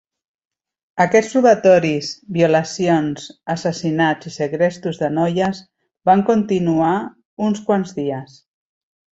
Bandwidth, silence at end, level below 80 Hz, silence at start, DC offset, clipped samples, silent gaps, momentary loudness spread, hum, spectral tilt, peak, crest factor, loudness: 8.2 kHz; 0.95 s; -58 dBFS; 0.95 s; under 0.1%; under 0.1%; 7.25-7.37 s; 11 LU; none; -6 dB/octave; -2 dBFS; 16 dB; -18 LUFS